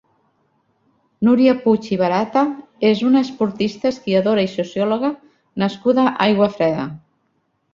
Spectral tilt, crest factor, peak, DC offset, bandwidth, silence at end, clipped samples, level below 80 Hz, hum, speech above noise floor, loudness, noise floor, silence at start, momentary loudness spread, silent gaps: -7 dB/octave; 18 dB; 0 dBFS; under 0.1%; 7.4 kHz; 0.75 s; under 0.1%; -60 dBFS; none; 50 dB; -18 LUFS; -67 dBFS; 1.2 s; 8 LU; none